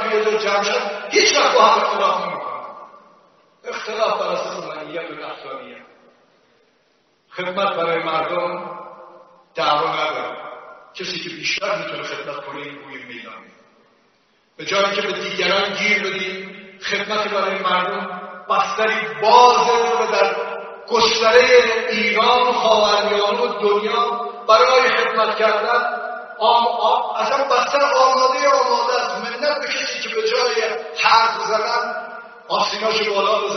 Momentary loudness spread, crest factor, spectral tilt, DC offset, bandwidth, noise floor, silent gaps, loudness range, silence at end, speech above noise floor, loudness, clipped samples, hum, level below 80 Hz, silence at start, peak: 18 LU; 20 dB; 0 dB/octave; under 0.1%; 6.6 kHz; -61 dBFS; none; 11 LU; 0 s; 43 dB; -17 LUFS; under 0.1%; none; -62 dBFS; 0 s; 0 dBFS